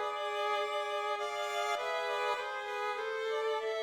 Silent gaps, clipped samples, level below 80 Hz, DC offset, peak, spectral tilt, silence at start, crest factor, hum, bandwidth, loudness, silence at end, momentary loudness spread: none; under 0.1%; -82 dBFS; under 0.1%; -22 dBFS; 0 dB/octave; 0 s; 14 dB; none; 18 kHz; -35 LUFS; 0 s; 3 LU